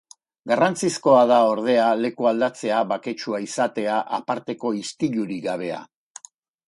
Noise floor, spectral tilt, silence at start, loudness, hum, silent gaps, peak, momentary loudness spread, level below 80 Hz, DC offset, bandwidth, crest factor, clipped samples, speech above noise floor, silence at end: -46 dBFS; -4.5 dB/octave; 0.45 s; -22 LUFS; none; none; -4 dBFS; 12 LU; -70 dBFS; under 0.1%; 11.5 kHz; 18 dB; under 0.1%; 25 dB; 0.85 s